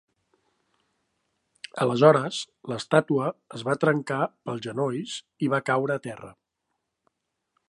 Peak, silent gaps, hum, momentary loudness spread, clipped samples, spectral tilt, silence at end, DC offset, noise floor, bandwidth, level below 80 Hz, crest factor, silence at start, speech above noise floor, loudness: -2 dBFS; none; none; 15 LU; under 0.1%; -6 dB/octave; 1.4 s; under 0.1%; -80 dBFS; 11.5 kHz; -74 dBFS; 24 dB; 1.75 s; 55 dB; -25 LUFS